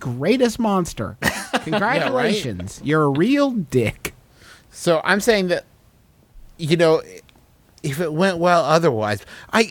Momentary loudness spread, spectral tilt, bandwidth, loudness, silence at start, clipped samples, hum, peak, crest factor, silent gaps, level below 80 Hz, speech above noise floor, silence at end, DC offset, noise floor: 11 LU; -5 dB/octave; 19 kHz; -19 LUFS; 0 s; under 0.1%; none; -2 dBFS; 20 dB; none; -48 dBFS; 35 dB; 0 s; under 0.1%; -54 dBFS